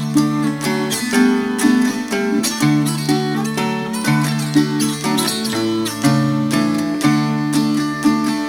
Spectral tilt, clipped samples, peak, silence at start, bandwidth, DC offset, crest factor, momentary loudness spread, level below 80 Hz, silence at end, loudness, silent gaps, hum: -5 dB/octave; under 0.1%; -2 dBFS; 0 s; 18.5 kHz; under 0.1%; 16 dB; 4 LU; -54 dBFS; 0 s; -17 LUFS; none; none